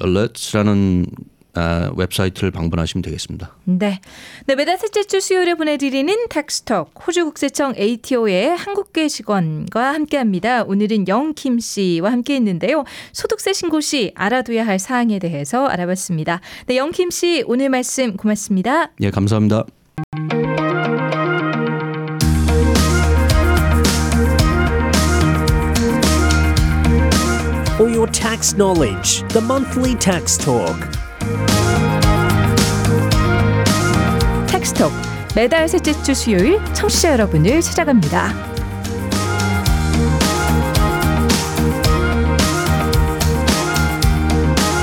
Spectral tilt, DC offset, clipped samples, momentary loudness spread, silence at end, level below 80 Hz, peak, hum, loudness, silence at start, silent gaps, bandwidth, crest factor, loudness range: -5 dB/octave; under 0.1%; under 0.1%; 7 LU; 0 s; -26 dBFS; -2 dBFS; none; -17 LUFS; 0 s; 20.04-20.12 s; 18.5 kHz; 14 dB; 4 LU